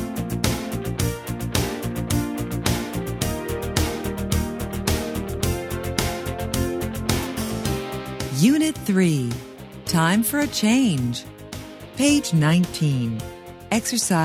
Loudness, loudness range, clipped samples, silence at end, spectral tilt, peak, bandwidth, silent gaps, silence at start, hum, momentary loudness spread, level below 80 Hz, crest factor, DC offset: -23 LUFS; 5 LU; under 0.1%; 0 s; -5 dB/octave; -2 dBFS; 16 kHz; none; 0 s; none; 11 LU; -36 dBFS; 20 dB; under 0.1%